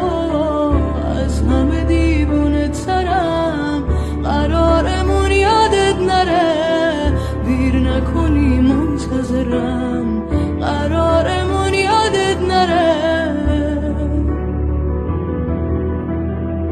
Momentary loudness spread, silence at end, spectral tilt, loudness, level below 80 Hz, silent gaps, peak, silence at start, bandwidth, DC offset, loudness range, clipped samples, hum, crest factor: 6 LU; 0 s; -6.5 dB/octave; -16 LUFS; -22 dBFS; none; -2 dBFS; 0 s; 10.5 kHz; under 0.1%; 3 LU; under 0.1%; none; 14 dB